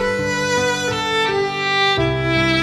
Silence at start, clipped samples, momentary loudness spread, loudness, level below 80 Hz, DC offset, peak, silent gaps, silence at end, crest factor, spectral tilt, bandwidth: 0 s; under 0.1%; 4 LU; -18 LUFS; -38 dBFS; under 0.1%; -6 dBFS; none; 0 s; 12 dB; -4 dB/octave; 15.5 kHz